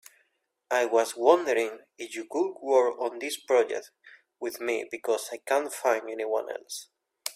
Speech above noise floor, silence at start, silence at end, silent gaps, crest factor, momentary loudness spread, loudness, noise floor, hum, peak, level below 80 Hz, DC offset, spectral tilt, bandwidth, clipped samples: 46 dB; 0.7 s; 0.05 s; none; 22 dB; 14 LU; -28 LUFS; -74 dBFS; none; -6 dBFS; -80 dBFS; under 0.1%; -1.5 dB/octave; 16 kHz; under 0.1%